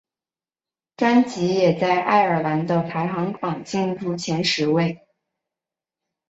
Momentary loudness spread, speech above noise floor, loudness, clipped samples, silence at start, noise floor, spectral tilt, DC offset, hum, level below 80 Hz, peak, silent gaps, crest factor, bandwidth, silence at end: 8 LU; over 70 dB; -21 LUFS; under 0.1%; 1 s; under -90 dBFS; -5.5 dB/octave; under 0.1%; none; -64 dBFS; -4 dBFS; none; 18 dB; 8 kHz; 1.35 s